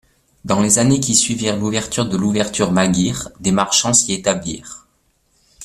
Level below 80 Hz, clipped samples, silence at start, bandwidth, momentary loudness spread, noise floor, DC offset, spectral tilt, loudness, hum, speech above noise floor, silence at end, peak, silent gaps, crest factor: -46 dBFS; under 0.1%; 0.45 s; 14.5 kHz; 10 LU; -62 dBFS; under 0.1%; -3.5 dB/octave; -16 LUFS; none; 45 dB; 0 s; 0 dBFS; none; 18 dB